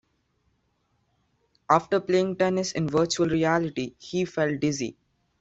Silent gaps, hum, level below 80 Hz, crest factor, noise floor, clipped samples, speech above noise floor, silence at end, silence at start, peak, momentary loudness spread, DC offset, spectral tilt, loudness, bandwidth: none; none; -60 dBFS; 22 dB; -71 dBFS; under 0.1%; 47 dB; 0.5 s; 1.7 s; -4 dBFS; 9 LU; under 0.1%; -5 dB/octave; -25 LUFS; 8 kHz